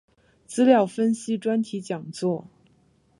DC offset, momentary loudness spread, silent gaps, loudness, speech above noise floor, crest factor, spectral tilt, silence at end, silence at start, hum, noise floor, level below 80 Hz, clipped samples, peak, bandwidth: under 0.1%; 14 LU; none; -24 LUFS; 39 dB; 20 dB; -6 dB/octave; 0.8 s; 0.5 s; none; -62 dBFS; -72 dBFS; under 0.1%; -4 dBFS; 11.5 kHz